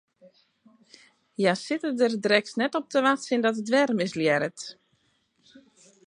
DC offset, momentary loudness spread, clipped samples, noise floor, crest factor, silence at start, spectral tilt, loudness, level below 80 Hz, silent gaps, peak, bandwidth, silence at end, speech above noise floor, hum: under 0.1%; 8 LU; under 0.1%; -70 dBFS; 22 dB; 1.4 s; -4.5 dB/octave; -25 LUFS; -78 dBFS; none; -6 dBFS; 11 kHz; 1.35 s; 44 dB; none